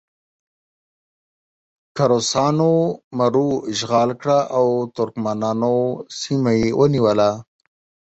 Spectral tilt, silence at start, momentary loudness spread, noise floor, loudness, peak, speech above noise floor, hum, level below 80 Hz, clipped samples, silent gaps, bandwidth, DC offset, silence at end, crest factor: -6 dB/octave; 1.95 s; 7 LU; under -90 dBFS; -19 LUFS; -4 dBFS; over 72 dB; none; -54 dBFS; under 0.1%; 3.04-3.11 s; 8.2 kHz; under 0.1%; 0.7 s; 16 dB